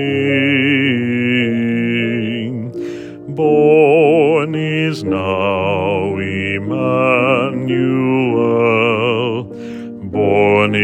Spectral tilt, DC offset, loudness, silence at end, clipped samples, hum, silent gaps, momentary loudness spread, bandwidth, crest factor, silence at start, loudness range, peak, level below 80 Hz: -7.5 dB/octave; under 0.1%; -15 LUFS; 0 s; under 0.1%; none; none; 13 LU; 9 kHz; 14 dB; 0 s; 2 LU; 0 dBFS; -58 dBFS